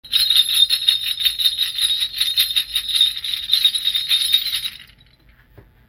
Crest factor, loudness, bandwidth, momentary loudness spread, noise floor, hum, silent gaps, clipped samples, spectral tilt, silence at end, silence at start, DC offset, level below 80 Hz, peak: 20 dB; -16 LUFS; 16.5 kHz; 6 LU; -52 dBFS; none; none; under 0.1%; 3 dB/octave; 1.05 s; 0.05 s; under 0.1%; -52 dBFS; 0 dBFS